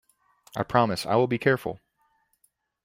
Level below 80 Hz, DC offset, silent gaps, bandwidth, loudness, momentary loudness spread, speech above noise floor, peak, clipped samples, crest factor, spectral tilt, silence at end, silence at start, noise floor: -62 dBFS; under 0.1%; none; 16.5 kHz; -25 LUFS; 14 LU; 46 dB; -4 dBFS; under 0.1%; 24 dB; -6 dB/octave; 1.1 s; 0.55 s; -70 dBFS